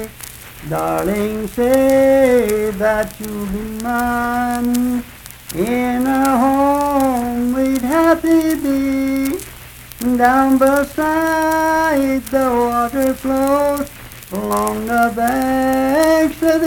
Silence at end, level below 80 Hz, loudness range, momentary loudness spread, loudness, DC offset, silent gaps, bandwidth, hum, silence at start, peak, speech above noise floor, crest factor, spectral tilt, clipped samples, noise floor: 0 s; -38 dBFS; 2 LU; 12 LU; -16 LUFS; under 0.1%; none; 19 kHz; none; 0 s; 0 dBFS; 21 dB; 16 dB; -5 dB/octave; under 0.1%; -36 dBFS